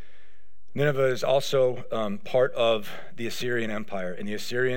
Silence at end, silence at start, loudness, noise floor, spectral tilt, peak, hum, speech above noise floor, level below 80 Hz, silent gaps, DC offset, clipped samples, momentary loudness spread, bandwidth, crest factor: 0 s; 0.75 s; -27 LUFS; -64 dBFS; -5 dB/octave; -10 dBFS; none; 38 dB; -66 dBFS; none; 3%; under 0.1%; 11 LU; 16.5 kHz; 16 dB